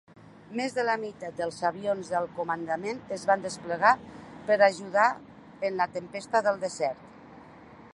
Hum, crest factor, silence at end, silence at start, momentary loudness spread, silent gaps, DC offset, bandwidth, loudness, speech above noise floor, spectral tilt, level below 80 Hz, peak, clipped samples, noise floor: none; 24 dB; 0.05 s; 0.25 s; 12 LU; none; under 0.1%; 11.5 kHz; -28 LUFS; 22 dB; -4 dB/octave; -68 dBFS; -6 dBFS; under 0.1%; -50 dBFS